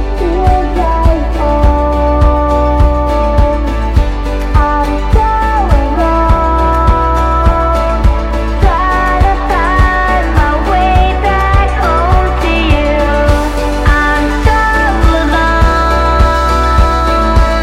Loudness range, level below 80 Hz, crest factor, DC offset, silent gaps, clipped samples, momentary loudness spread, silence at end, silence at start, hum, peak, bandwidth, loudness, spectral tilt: 2 LU; -12 dBFS; 10 dB; under 0.1%; none; under 0.1%; 3 LU; 0 s; 0 s; none; 0 dBFS; 10.5 kHz; -11 LUFS; -6.5 dB/octave